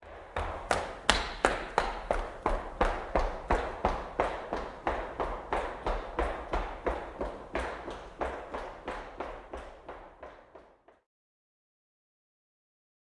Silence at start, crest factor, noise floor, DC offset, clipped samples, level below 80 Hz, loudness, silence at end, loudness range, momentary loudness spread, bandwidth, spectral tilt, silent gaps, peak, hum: 0 s; 34 dB; -58 dBFS; under 0.1%; under 0.1%; -42 dBFS; -34 LUFS; 2.4 s; 15 LU; 15 LU; 11.5 kHz; -4 dB/octave; none; -2 dBFS; none